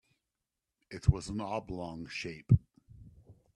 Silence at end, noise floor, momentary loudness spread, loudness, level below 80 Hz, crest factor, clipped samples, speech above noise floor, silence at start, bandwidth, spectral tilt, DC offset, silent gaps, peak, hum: 0.25 s; -88 dBFS; 12 LU; -33 LUFS; -46 dBFS; 24 dB; under 0.1%; 57 dB; 0.9 s; 11 kHz; -7 dB/octave; under 0.1%; none; -10 dBFS; none